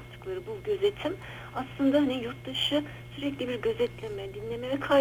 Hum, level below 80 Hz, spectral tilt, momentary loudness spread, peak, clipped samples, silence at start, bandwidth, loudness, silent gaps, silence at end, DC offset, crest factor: 60 Hz at -45 dBFS; -54 dBFS; -5.5 dB/octave; 12 LU; -12 dBFS; under 0.1%; 0 s; 18.5 kHz; -31 LUFS; none; 0 s; under 0.1%; 18 dB